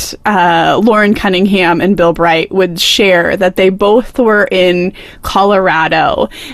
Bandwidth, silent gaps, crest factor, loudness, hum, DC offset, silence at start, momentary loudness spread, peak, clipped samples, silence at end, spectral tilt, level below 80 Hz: 15 kHz; none; 10 dB; -10 LUFS; none; 0.4%; 0 s; 5 LU; 0 dBFS; under 0.1%; 0 s; -4.5 dB/octave; -36 dBFS